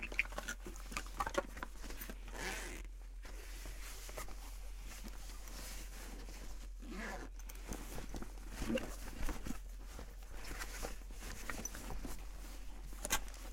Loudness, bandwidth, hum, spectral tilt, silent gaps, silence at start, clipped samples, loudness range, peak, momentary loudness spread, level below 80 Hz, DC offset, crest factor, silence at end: -46 LUFS; 16.5 kHz; none; -3 dB/octave; none; 0 s; under 0.1%; 5 LU; -16 dBFS; 12 LU; -48 dBFS; under 0.1%; 28 dB; 0 s